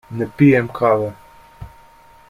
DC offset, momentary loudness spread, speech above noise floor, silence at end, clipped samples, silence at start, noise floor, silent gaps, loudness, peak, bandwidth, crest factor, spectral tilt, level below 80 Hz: under 0.1%; 13 LU; 31 dB; 0.65 s; under 0.1%; 0.1 s; -47 dBFS; none; -16 LUFS; -2 dBFS; 11 kHz; 18 dB; -9 dB/octave; -48 dBFS